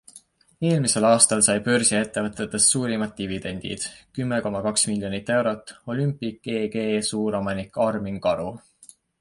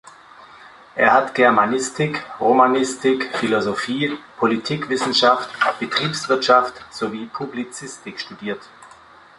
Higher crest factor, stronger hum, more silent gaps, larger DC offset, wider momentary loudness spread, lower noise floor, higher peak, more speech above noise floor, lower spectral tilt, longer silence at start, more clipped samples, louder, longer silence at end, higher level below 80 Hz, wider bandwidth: about the same, 22 dB vs 20 dB; neither; neither; neither; about the same, 13 LU vs 15 LU; first, -53 dBFS vs -46 dBFS; about the same, -2 dBFS vs 0 dBFS; about the same, 29 dB vs 27 dB; about the same, -3.5 dB/octave vs -4 dB/octave; about the same, 0.15 s vs 0.05 s; neither; second, -23 LUFS vs -19 LUFS; about the same, 0.65 s vs 0.55 s; first, -54 dBFS vs -62 dBFS; about the same, 11.5 kHz vs 11.5 kHz